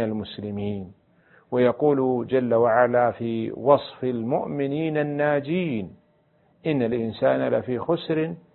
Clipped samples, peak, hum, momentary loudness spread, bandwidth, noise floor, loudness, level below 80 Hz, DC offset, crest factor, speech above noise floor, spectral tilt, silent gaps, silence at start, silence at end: under 0.1%; -4 dBFS; none; 11 LU; 4.3 kHz; -62 dBFS; -24 LUFS; -58 dBFS; under 0.1%; 20 dB; 39 dB; -11.5 dB/octave; none; 0 s; 0.15 s